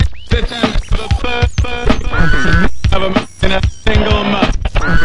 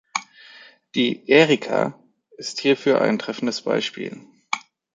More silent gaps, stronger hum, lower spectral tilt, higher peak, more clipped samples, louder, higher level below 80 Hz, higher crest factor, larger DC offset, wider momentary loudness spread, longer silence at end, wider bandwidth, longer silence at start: neither; neither; about the same, -5.5 dB/octave vs -4.5 dB/octave; about the same, 0 dBFS vs -2 dBFS; neither; first, -15 LUFS vs -21 LUFS; first, -16 dBFS vs -70 dBFS; second, 14 dB vs 20 dB; first, 10% vs under 0.1%; second, 5 LU vs 14 LU; second, 0 s vs 0.35 s; first, 11 kHz vs 9.4 kHz; second, 0 s vs 0.15 s